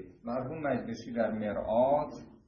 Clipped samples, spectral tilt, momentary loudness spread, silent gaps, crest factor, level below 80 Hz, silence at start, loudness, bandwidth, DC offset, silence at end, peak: under 0.1%; -7.5 dB/octave; 10 LU; none; 16 dB; -58 dBFS; 0 s; -32 LUFS; 7 kHz; under 0.1%; 0.15 s; -16 dBFS